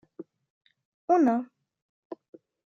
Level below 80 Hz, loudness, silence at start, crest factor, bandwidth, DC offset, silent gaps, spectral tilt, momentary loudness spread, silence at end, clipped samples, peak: -84 dBFS; -25 LUFS; 0.2 s; 20 dB; 7 kHz; under 0.1%; 0.50-0.61 s, 0.85-1.08 s, 1.82-2.10 s; -7.5 dB/octave; 25 LU; 0.5 s; under 0.1%; -10 dBFS